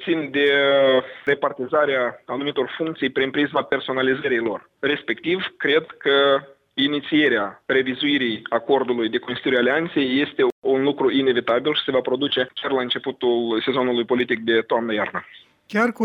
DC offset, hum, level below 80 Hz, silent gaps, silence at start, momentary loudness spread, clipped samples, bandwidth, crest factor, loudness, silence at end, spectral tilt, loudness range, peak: under 0.1%; none; -66 dBFS; 10.52-10.62 s; 0 s; 6 LU; under 0.1%; 6.8 kHz; 16 dB; -21 LUFS; 0 s; -6 dB/octave; 2 LU; -4 dBFS